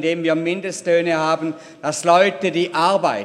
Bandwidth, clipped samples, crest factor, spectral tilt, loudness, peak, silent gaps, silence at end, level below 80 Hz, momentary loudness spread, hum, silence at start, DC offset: 13 kHz; under 0.1%; 18 dB; -4.5 dB/octave; -19 LUFS; -2 dBFS; none; 0 s; -66 dBFS; 9 LU; none; 0 s; under 0.1%